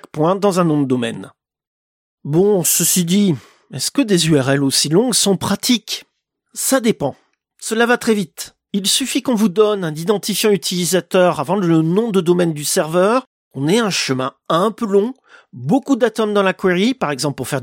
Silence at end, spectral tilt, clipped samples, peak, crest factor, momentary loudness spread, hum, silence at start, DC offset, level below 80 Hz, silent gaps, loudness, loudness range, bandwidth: 0 s; -4 dB/octave; under 0.1%; -2 dBFS; 16 dB; 10 LU; none; 0.15 s; under 0.1%; -58 dBFS; 1.67-2.18 s, 13.27-13.51 s; -16 LUFS; 3 LU; 17 kHz